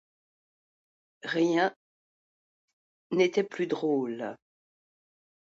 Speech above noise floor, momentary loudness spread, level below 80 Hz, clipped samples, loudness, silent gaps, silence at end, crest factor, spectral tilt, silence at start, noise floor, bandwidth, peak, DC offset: over 62 dB; 11 LU; -82 dBFS; under 0.1%; -29 LUFS; 1.76-3.10 s; 1.25 s; 22 dB; -5.5 dB/octave; 1.25 s; under -90 dBFS; 7.8 kHz; -12 dBFS; under 0.1%